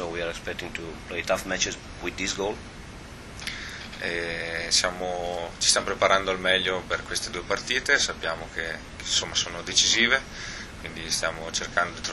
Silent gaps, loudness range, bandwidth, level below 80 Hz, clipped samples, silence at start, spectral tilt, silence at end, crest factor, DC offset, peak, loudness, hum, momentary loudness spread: none; 7 LU; 13 kHz; -46 dBFS; under 0.1%; 0 s; -1.5 dB/octave; 0 s; 24 dB; under 0.1%; -4 dBFS; -26 LUFS; none; 14 LU